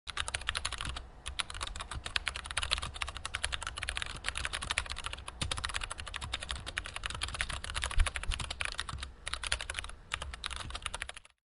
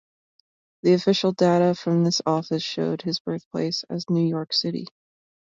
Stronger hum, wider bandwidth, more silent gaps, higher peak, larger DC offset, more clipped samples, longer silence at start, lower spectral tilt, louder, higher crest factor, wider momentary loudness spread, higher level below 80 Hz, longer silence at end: neither; first, 11.5 kHz vs 7.6 kHz; second, none vs 3.20-3.25 s, 3.46-3.51 s; about the same, -8 dBFS vs -8 dBFS; neither; neither; second, 0.05 s vs 0.85 s; second, -1.5 dB/octave vs -6 dB/octave; second, -37 LUFS vs -23 LUFS; first, 30 dB vs 16 dB; about the same, 7 LU vs 9 LU; first, -44 dBFS vs -68 dBFS; second, 0.3 s vs 0.65 s